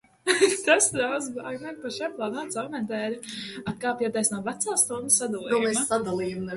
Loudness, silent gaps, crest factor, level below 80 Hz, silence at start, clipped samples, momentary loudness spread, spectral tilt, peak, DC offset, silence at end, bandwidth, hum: -26 LUFS; none; 20 dB; -64 dBFS; 0.25 s; under 0.1%; 14 LU; -2.5 dB/octave; -6 dBFS; under 0.1%; 0 s; 12 kHz; none